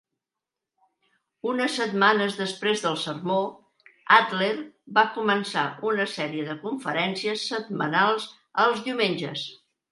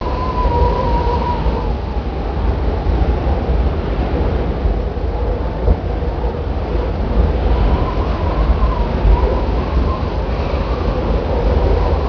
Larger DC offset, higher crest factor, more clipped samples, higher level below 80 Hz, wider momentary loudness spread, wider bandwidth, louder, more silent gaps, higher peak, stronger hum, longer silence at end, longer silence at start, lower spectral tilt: neither; first, 24 dB vs 14 dB; neither; second, -78 dBFS vs -18 dBFS; first, 11 LU vs 5 LU; first, 11.5 kHz vs 5.4 kHz; second, -25 LUFS vs -18 LUFS; neither; about the same, -2 dBFS vs -2 dBFS; neither; first, 0.35 s vs 0 s; first, 1.45 s vs 0 s; second, -4 dB/octave vs -9 dB/octave